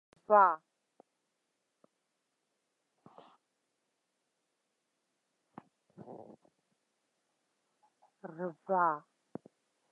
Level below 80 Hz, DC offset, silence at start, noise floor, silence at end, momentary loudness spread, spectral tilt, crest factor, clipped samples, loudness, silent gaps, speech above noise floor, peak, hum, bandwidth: under -90 dBFS; under 0.1%; 0.3 s; -84 dBFS; 0.95 s; 27 LU; -8.5 dB/octave; 28 dB; under 0.1%; -30 LUFS; none; 54 dB; -12 dBFS; none; 5.8 kHz